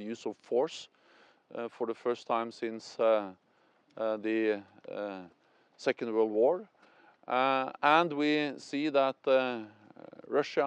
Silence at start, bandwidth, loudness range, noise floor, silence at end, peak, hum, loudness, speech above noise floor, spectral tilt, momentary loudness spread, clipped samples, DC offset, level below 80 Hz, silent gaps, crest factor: 0 s; 9 kHz; 5 LU; -68 dBFS; 0 s; -10 dBFS; none; -31 LUFS; 37 dB; -5 dB/octave; 14 LU; under 0.1%; under 0.1%; -90 dBFS; none; 22 dB